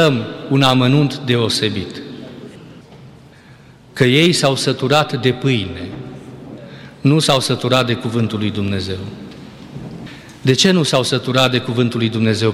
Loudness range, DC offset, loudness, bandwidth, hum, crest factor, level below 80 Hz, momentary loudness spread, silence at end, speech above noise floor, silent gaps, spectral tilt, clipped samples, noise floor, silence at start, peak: 3 LU; under 0.1%; -16 LUFS; 16 kHz; none; 16 dB; -52 dBFS; 22 LU; 0 s; 27 dB; none; -5 dB/octave; under 0.1%; -43 dBFS; 0 s; -2 dBFS